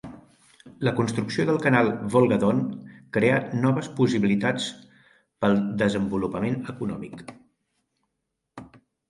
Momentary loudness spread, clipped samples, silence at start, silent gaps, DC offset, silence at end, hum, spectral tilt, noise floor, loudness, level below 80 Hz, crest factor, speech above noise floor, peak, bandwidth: 12 LU; under 0.1%; 0.05 s; none; under 0.1%; 0.4 s; none; -6.5 dB/octave; -80 dBFS; -24 LUFS; -58 dBFS; 22 dB; 57 dB; -4 dBFS; 11.5 kHz